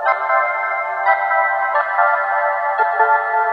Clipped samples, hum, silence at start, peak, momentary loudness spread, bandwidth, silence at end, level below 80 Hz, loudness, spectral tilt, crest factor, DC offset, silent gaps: under 0.1%; 50 Hz at -65 dBFS; 0 s; 0 dBFS; 3 LU; 5.8 kHz; 0 s; -66 dBFS; -16 LUFS; -3 dB/octave; 16 dB; under 0.1%; none